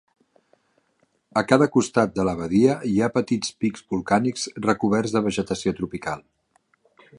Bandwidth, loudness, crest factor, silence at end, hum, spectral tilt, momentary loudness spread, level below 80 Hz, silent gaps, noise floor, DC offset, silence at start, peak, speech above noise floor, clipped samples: 11 kHz; -23 LUFS; 22 dB; 1 s; none; -5.5 dB/octave; 10 LU; -54 dBFS; none; -68 dBFS; under 0.1%; 1.35 s; -2 dBFS; 46 dB; under 0.1%